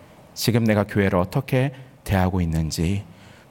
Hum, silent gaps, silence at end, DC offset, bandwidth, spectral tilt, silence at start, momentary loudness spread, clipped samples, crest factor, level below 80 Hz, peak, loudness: none; none; 0.45 s; under 0.1%; 17 kHz; -6 dB/octave; 0.35 s; 8 LU; under 0.1%; 18 dB; -42 dBFS; -4 dBFS; -22 LUFS